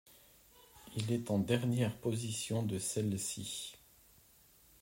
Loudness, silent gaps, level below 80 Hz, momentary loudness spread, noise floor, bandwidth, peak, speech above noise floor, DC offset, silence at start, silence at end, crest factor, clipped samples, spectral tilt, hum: -37 LUFS; none; -70 dBFS; 10 LU; -65 dBFS; 16 kHz; -16 dBFS; 29 dB; under 0.1%; 0.1 s; 1.05 s; 22 dB; under 0.1%; -5 dB/octave; none